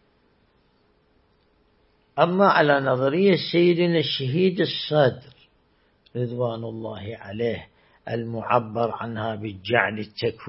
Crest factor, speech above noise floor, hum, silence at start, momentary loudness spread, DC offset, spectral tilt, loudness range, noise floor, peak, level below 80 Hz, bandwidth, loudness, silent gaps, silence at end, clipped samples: 20 dB; 41 dB; none; 2.15 s; 15 LU; under 0.1%; -10.5 dB/octave; 8 LU; -63 dBFS; -4 dBFS; -64 dBFS; 5.8 kHz; -23 LUFS; none; 0 s; under 0.1%